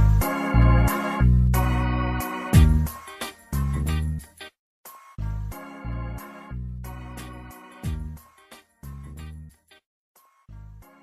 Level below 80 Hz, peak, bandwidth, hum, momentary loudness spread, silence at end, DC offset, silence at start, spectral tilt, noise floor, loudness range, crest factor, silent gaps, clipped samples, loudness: -28 dBFS; -4 dBFS; 15 kHz; none; 24 LU; 0.2 s; under 0.1%; 0 s; -6.5 dB/octave; -52 dBFS; 18 LU; 20 dB; 4.59-4.84 s, 9.86-10.15 s; under 0.1%; -24 LUFS